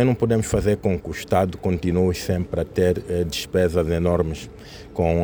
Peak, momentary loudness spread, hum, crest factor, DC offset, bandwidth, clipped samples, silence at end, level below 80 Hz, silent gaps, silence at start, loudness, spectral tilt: -4 dBFS; 7 LU; none; 16 dB; under 0.1%; over 20 kHz; under 0.1%; 0 s; -40 dBFS; none; 0 s; -22 LUFS; -6.5 dB/octave